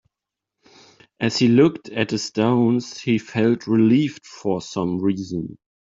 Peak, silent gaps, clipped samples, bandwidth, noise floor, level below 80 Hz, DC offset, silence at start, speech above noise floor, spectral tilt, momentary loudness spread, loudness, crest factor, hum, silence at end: -4 dBFS; none; under 0.1%; 7.8 kHz; -85 dBFS; -60 dBFS; under 0.1%; 1.2 s; 66 dB; -6 dB/octave; 10 LU; -21 LUFS; 18 dB; none; 0.35 s